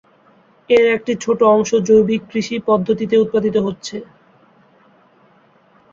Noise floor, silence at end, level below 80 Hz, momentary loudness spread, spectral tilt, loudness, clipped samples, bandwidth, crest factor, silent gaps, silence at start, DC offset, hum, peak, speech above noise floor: -53 dBFS; 1.9 s; -54 dBFS; 10 LU; -5.5 dB/octave; -16 LUFS; under 0.1%; 7.6 kHz; 16 dB; none; 0.7 s; under 0.1%; none; -2 dBFS; 37 dB